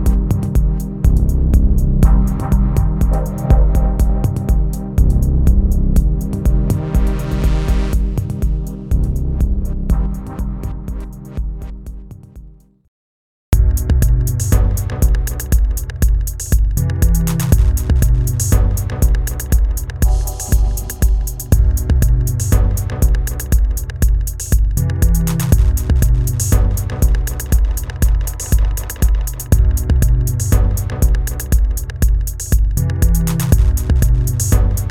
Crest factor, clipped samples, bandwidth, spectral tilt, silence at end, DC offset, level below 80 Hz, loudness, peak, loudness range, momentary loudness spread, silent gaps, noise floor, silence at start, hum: 14 dB; under 0.1%; 17 kHz; -6 dB/octave; 0 s; under 0.1%; -16 dBFS; -17 LUFS; 0 dBFS; 5 LU; 6 LU; 12.88-13.52 s; -39 dBFS; 0 s; none